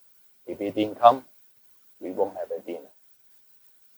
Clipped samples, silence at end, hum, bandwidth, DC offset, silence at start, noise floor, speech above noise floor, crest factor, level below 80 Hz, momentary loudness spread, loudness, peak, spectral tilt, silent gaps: under 0.1%; 1.15 s; none; over 20 kHz; under 0.1%; 0.5 s; -57 dBFS; 34 dB; 26 dB; -76 dBFS; 21 LU; -25 LUFS; -2 dBFS; -6 dB/octave; none